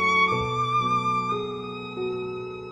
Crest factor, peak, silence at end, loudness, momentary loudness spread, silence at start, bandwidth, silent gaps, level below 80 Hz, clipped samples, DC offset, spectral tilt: 16 dB; -10 dBFS; 0 s; -25 LUFS; 12 LU; 0 s; 11 kHz; none; -54 dBFS; under 0.1%; under 0.1%; -5 dB/octave